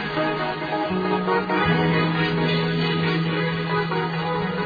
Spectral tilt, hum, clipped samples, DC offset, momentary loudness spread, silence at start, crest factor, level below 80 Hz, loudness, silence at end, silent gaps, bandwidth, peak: -8 dB/octave; none; under 0.1%; under 0.1%; 5 LU; 0 s; 14 dB; -50 dBFS; -22 LUFS; 0 s; none; 5 kHz; -8 dBFS